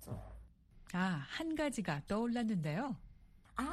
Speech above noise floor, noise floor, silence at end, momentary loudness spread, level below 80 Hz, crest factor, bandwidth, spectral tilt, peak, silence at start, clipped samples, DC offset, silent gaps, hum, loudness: 23 dB; -60 dBFS; 0 s; 13 LU; -58 dBFS; 18 dB; 13.5 kHz; -6 dB/octave; -22 dBFS; 0 s; under 0.1%; under 0.1%; none; none; -39 LUFS